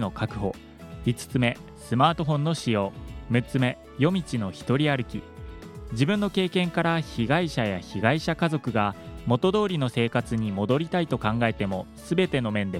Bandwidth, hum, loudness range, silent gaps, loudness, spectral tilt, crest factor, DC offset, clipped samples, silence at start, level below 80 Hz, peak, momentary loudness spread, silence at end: 14.5 kHz; none; 2 LU; none; -26 LUFS; -6.5 dB/octave; 22 dB; under 0.1%; under 0.1%; 0 s; -48 dBFS; -4 dBFS; 10 LU; 0 s